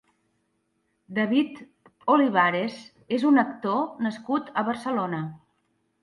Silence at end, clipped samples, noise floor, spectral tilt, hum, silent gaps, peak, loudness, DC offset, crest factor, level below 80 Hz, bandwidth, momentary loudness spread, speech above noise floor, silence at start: 0.65 s; under 0.1%; -73 dBFS; -7 dB/octave; none; none; -8 dBFS; -25 LUFS; under 0.1%; 20 dB; -74 dBFS; 11.5 kHz; 12 LU; 49 dB; 1.1 s